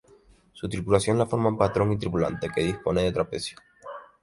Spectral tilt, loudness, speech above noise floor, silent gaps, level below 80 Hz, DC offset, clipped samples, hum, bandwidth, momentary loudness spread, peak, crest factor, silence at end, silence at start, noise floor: -6 dB/octave; -26 LUFS; 32 dB; none; -48 dBFS; under 0.1%; under 0.1%; none; 11.5 kHz; 16 LU; -6 dBFS; 20 dB; 0.2 s; 0.55 s; -57 dBFS